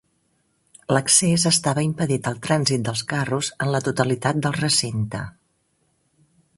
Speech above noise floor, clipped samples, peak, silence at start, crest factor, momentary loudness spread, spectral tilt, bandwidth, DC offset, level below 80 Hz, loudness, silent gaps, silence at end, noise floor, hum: 46 dB; under 0.1%; -2 dBFS; 0.9 s; 20 dB; 11 LU; -3.5 dB/octave; 12 kHz; under 0.1%; -56 dBFS; -21 LUFS; none; 1.3 s; -68 dBFS; none